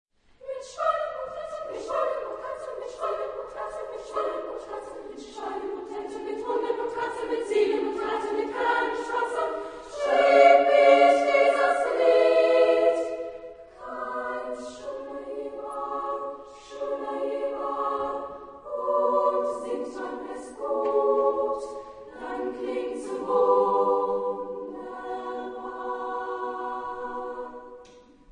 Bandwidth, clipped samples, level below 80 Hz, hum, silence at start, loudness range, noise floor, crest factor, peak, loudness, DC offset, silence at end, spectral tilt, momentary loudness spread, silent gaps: 10.5 kHz; under 0.1%; -62 dBFS; none; 0.4 s; 14 LU; -52 dBFS; 22 dB; -4 dBFS; -26 LUFS; under 0.1%; 0.35 s; -3.5 dB/octave; 18 LU; none